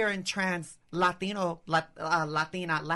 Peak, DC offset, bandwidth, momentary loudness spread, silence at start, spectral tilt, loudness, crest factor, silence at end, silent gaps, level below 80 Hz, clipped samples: -14 dBFS; under 0.1%; 11.5 kHz; 4 LU; 0 s; -4.5 dB/octave; -30 LUFS; 16 dB; 0 s; none; -64 dBFS; under 0.1%